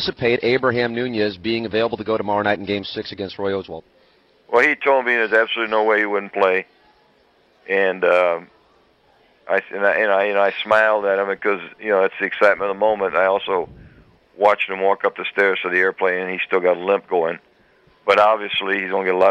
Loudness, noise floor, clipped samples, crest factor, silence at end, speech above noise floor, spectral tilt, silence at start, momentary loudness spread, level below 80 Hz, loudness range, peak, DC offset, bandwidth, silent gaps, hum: -19 LUFS; -57 dBFS; under 0.1%; 16 dB; 0 s; 38 dB; -6 dB/octave; 0 s; 8 LU; -58 dBFS; 4 LU; -4 dBFS; under 0.1%; 8.4 kHz; none; none